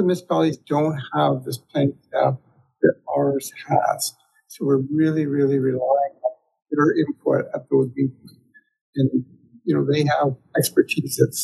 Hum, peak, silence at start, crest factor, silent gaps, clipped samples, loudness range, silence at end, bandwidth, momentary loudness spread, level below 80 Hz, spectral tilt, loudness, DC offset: none; -2 dBFS; 0 s; 20 dB; 8.81-8.93 s; under 0.1%; 2 LU; 0 s; 12.5 kHz; 8 LU; -70 dBFS; -6 dB/octave; -22 LUFS; under 0.1%